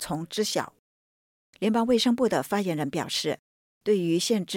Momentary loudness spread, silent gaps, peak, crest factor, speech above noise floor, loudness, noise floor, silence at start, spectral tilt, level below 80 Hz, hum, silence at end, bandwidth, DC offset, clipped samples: 9 LU; 0.79-1.53 s, 3.39-3.81 s; -12 dBFS; 14 dB; over 64 dB; -26 LUFS; under -90 dBFS; 0 s; -4.5 dB/octave; -64 dBFS; none; 0 s; 17 kHz; under 0.1%; under 0.1%